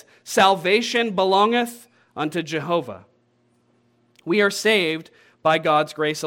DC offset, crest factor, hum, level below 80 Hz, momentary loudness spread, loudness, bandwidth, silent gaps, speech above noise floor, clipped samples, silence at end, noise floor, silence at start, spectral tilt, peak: under 0.1%; 20 dB; none; -74 dBFS; 12 LU; -20 LUFS; 17 kHz; none; 43 dB; under 0.1%; 0 s; -63 dBFS; 0.25 s; -4 dB/octave; -2 dBFS